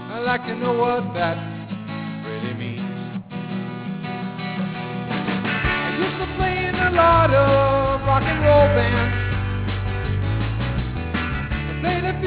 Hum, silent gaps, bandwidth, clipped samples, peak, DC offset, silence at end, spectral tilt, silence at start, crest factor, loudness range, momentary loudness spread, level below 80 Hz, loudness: none; none; 4 kHz; under 0.1%; -4 dBFS; under 0.1%; 0 s; -10.5 dB/octave; 0 s; 18 dB; 11 LU; 14 LU; -32 dBFS; -21 LUFS